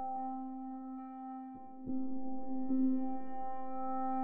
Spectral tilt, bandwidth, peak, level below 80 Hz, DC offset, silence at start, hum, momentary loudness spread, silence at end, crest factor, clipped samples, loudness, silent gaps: -9 dB/octave; 2.5 kHz; -24 dBFS; -70 dBFS; under 0.1%; 0 s; none; 12 LU; 0 s; 14 dB; under 0.1%; -40 LUFS; none